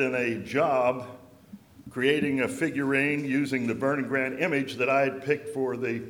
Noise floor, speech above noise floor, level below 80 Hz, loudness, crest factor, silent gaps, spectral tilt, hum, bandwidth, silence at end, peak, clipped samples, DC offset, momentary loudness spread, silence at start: -50 dBFS; 23 dB; -66 dBFS; -27 LUFS; 18 dB; none; -6 dB/octave; none; 16.5 kHz; 0 s; -8 dBFS; under 0.1%; under 0.1%; 5 LU; 0 s